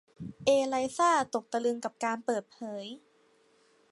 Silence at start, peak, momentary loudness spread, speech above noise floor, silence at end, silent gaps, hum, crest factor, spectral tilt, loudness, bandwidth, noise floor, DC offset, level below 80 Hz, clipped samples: 0.2 s; -12 dBFS; 16 LU; 36 dB; 0.95 s; none; none; 18 dB; -3.5 dB/octave; -30 LUFS; 11.5 kHz; -66 dBFS; under 0.1%; -72 dBFS; under 0.1%